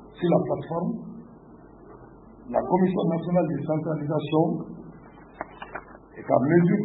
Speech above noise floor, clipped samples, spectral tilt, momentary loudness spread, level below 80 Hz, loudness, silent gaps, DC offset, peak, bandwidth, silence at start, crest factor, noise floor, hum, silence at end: 25 dB; under 0.1%; -12.5 dB/octave; 19 LU; -58 dBFS; -25 LUFS; none; under 0.1%; -6 dBFS; 4 kHz; 0 s; 20 dB; -48 dBFS; none; 0 s